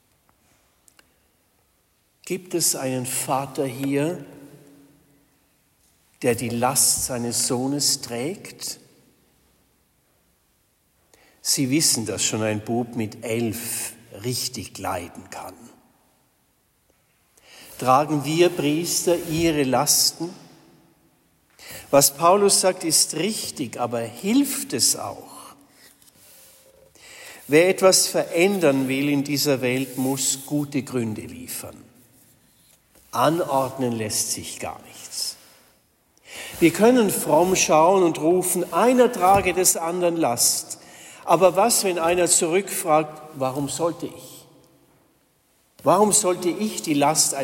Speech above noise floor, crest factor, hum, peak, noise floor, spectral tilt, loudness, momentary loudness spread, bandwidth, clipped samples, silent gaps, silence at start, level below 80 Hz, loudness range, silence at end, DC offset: 44 dB; 20 dB; none; -2 dBFS; -65 dBFS; -3 dB/octave; -21 LUFS; 17 LU; 16.5 kHz; under 0.1%; none; 2.25 s; -58 dBFS; 9 LU; 0 s; under 0.1%